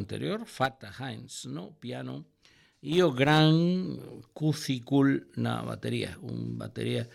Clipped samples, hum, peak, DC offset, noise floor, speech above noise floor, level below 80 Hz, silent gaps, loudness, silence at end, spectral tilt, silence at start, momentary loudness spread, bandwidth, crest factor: under 0.1%; none; -8 dBFS; under 0.1%; -60 dBFS; 31 dB; -64 dBFS; none; -29 LUFS; 0.05 s; -6 dB/octave; 0 s; 17 LU; 14 kHz; 20 dB